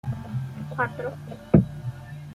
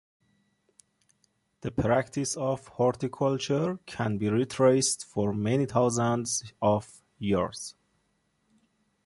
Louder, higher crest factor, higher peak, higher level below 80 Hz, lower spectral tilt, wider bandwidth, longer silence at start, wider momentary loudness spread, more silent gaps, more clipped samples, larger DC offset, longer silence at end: about the same, -27 LUFS vs -28 LUFS; about the same, 24 dB vs 20 dB; first, -2 dBFS vs -10 dBFS; first, -46 dBFS vs -56 dBFS; first, -9.5 dB/octave vs -5 dB/octave; about the same, 12.5 kHz vs 11.5 kHz; second, 0.05 s vs 1.65 s; first, 15 LU vs 9 LU; neither; neither; neither; second, 0 s vs 1.35 s